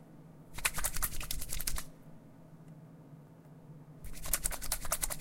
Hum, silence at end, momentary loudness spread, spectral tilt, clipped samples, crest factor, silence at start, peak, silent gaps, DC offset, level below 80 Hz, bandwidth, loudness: none; 0 s; 22 LU; -1.5 dB/octave; under 0.1%; 28 dB; 0 s; -10 dBFS; none; under 0.1%; -44 dBFS; 17 kHz; -36 LUFS